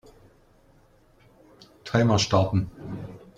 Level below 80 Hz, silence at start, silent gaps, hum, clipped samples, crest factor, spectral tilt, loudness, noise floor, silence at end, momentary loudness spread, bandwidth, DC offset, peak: -52 dBFS; 1.85 s; none; none; under 0.1%; 20 dB; -5.5 dB/octave; -23 LUFS; -58 dBFS; 0.2 s; 17 LU; 9.2 kHz; under 0.1%; -6 dBFS